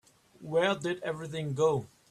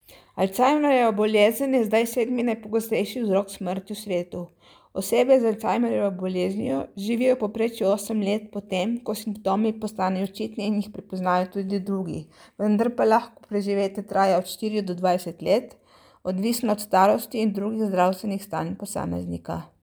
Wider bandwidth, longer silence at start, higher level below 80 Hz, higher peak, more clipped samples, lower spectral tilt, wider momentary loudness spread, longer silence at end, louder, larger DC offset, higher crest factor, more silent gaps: second, 13 kHz vs over 20 kHz; first, 0.4 s vs 0.1 s; second, -68 dBFS vs -62 dBFS; second, -12 dBFS vs -6 dBFS; neither; about the same, -5.5 dB/octave vs -5.5 dB/octave; about the same, 8 LU vs 10 LU; about the same, 0.25 s vs 0.2 s; second, -31 LUFS vs -24 LUFS; neither; about the same, 18 dB vs 18 dB; neither